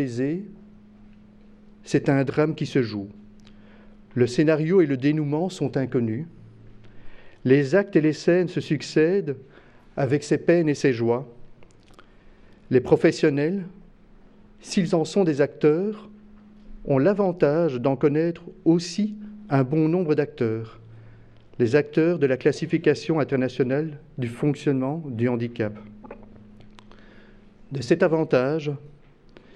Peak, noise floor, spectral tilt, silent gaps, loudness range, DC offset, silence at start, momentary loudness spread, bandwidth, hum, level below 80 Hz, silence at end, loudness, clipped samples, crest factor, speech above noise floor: -4 dBFS; -50 dBFS; -7 dB/octave; none; 4 LU; under 0.1%; 0 s; 13 LU; 10.5 kHz; none; -54 dBFS; 0.15 s; -23 LUFS; under 0.1%; 20 dB; 28 dB